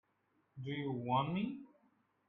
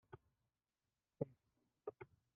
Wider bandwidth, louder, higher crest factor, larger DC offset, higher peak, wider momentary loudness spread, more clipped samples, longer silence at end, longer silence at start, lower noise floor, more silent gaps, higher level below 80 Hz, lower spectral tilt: first, 4.2 kHz vs 3.5 kHz; first, -39 LUFS vs -53 LUFS; second, 20 dB vs 30 dB; neither; first, -22 dBFS vs -26 dBFS; about the same, 16 LU vs 15 LU; neither; first, 0.6 s vs 0.3 s; first, 0.55 s vs 0.1 s; second, -78 dBFS vs under -90 dBFS; neither; first, -76 dBFS vs -84 dBFS; first, -9 dB/octave vs -7 dB/octave